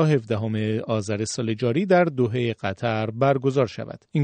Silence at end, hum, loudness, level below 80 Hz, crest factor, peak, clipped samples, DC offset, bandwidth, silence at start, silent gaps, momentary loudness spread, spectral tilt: 0 s; none; -23 LUFS; -62 dBFS; 16 dB; -6 dBFS; under 0.1%; under 0.1%; 9.4 kHz; 0 s; none; 7 LU; -6.5 dB/octave